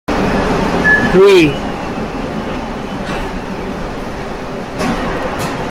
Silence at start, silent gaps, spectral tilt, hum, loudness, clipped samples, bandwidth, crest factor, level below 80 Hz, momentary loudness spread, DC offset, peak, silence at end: 0.1 s; none; -5.5 dB/octave; none; -15 LUFS; under 0.1%; 15.5 kHz; 14 dB; -30 dBFS; 15 LU; under 0.1%; 0 dBFS; 0 s